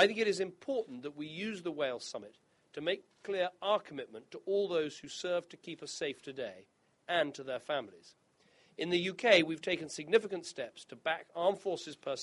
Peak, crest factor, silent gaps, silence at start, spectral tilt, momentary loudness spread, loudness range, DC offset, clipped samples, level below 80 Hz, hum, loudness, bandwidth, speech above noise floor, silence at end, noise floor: -12 dBFS; 24 dB; none; 0 s; -3.5 dB/octave; 14 LU; 6 LU; under 0.1%; under 0.1%; -80 dBFS; none; -35 LUFS; 11.5 kHz; 33 dB; 0 s; -68 dBFS